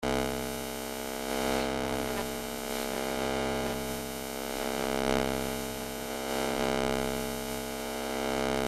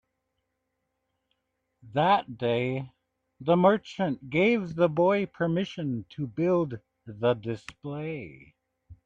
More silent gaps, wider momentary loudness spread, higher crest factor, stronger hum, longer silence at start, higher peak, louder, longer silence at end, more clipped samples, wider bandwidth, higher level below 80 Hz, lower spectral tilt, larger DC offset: neither; second, 6 LU vs 14 LU; about the same, 22 dB vs 20 dB; neither; second, 0 s vs 1.85 s; about the same, -10 dBFS vs -8 dBFS; second, -32 LUFS vs -27 LUFS; about the same, 0 s vs 0.1 s; neither; first, 16 kHz vs 8 kHz; first, -48 dBFS vs -64 dBFS; second, -3.5 dB/octave vs -7.5 dB/octave; neither